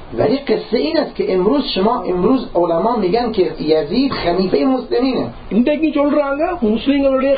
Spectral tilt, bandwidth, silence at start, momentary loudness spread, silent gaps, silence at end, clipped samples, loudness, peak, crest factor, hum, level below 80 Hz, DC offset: -11.5 dB/octave; 5 kHz; 0 s; 3 LU; none; 0 s; under 0.1%; -16 LUFS; 0 dBFS; 16 dB; none; -40 dBFS; under 0.1%